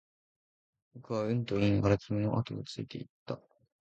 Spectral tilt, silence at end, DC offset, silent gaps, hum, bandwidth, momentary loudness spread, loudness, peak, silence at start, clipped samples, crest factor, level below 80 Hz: -7.5 dB/octave; 0.45 s; under 0.1%; 3.09-3.26 s; none; 8 kHz; 15 LU; -32 LUFS; -12 dBFS; 0.95 s; under 0.1%; 22 dB; -56 dBFS